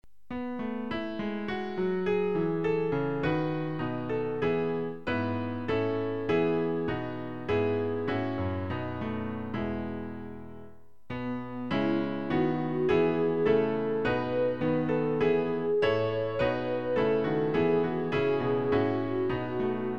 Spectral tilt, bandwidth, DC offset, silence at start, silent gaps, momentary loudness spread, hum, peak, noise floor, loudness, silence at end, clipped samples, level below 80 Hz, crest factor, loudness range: -8.5 dB/octave; 6.4 kHz; 0.5%; 0.3 s; none; 8 LU; none; -12 dBFS; -53 dBFS; -29 LUFS; 0 s; under 0.1%; -56 dBFS; 16 dB; 6 LU